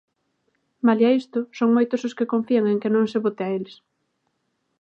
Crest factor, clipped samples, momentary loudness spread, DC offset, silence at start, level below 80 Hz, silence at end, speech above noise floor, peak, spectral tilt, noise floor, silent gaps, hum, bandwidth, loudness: 16 dB; under 0.1%; 9 LU; under 0.1%; 0.85 s; -78 dBFS; 1.05 s; 52 dB; -6 dBFS; -7 dB/octave; -73 dBFS; none; none; 7.2 kHz; -22 LUFS